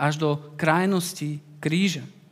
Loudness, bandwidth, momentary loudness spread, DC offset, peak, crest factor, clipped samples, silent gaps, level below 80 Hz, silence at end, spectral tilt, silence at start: -25 LUFS; 16 kHz; 10 LU; under 0.1%; -4 dBFS; 22 dB; under 0.1%; none; -74 dBFS; 0.2 s; -5.5 dB/octave; 0 s